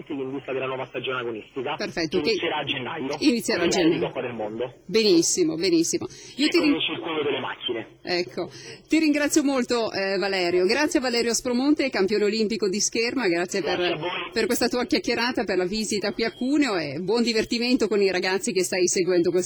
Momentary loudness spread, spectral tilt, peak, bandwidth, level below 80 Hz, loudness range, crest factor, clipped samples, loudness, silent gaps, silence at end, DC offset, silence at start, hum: 9 LU; -3 dB/octave; -10 dBFS; over 20 kHz; -58 dBFS; 2 LU; 14 dB; under 0.1%; -24 LUFS; none; 0 s; under 0.1%; 0 s; none